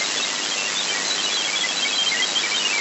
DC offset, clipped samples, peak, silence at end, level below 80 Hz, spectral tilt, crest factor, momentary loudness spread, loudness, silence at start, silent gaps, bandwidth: under 0.1%; under 0.1%; -8 dBFS; 0 s; under -90 dBFS; 1 dB/octave; 14 dB; 3 LU; -20 LUFS; 0 s; none; 8.2 kHz